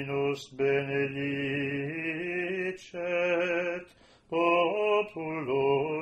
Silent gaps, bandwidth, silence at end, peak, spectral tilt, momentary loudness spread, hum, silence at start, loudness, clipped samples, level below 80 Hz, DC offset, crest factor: none; 8.8 kHz; 0 s; -12 dBFS; -6.5 dB/octave; 9 LU; none; 0 s; -29 LUFS; under 0.1%; -66 dBFS; under 0.1%; 16 dB